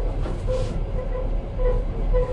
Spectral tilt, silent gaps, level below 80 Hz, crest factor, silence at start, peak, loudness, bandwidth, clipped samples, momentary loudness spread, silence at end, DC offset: -8 dB/octave; none; -24 dBFS; 12 dB; 0 s; -10 dBFS; -27 LUFS; 7.2 kHz; under 0.1%; 4 LU; 0 s; under 0.1%